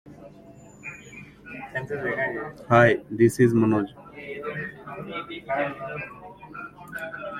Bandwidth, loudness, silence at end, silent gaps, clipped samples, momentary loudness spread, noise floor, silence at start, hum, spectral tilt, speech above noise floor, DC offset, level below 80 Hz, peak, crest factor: 15 kHz; -25 LUFS; 0 s; none; under 0.1%; 22 LU; -48 dBFS; 0.05 s; none; -7 dB/octave; 25 dB; under 0.1%; -58 dBFS; -2 dBFS; 24 dB